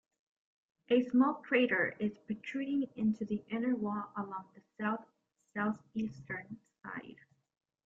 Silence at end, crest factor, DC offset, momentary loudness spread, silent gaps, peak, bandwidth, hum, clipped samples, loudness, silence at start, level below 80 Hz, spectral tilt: 0.75 s; 20 dB; under 0.1%; 16 LU; none; -16 dBFS; 7.2 kHz; none; under 0.1%; -35 LUFS; 0.9 s; -76 dBFS; -7.5 dB/octave